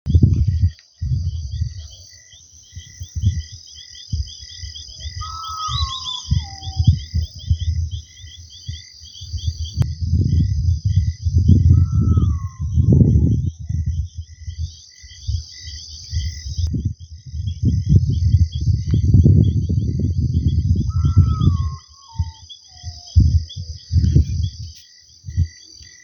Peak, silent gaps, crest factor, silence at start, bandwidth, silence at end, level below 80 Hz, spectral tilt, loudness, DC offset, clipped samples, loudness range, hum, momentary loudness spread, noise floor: 0 dBFS; none; 18 dB; 0.05 s; 6.8 kHz; 0.2 s; -26 dBFS; -7 dB/octave; -19 LUFS; under 0.1%; under 0.1%; 11 LU; none; 20 LU; -46 dBFS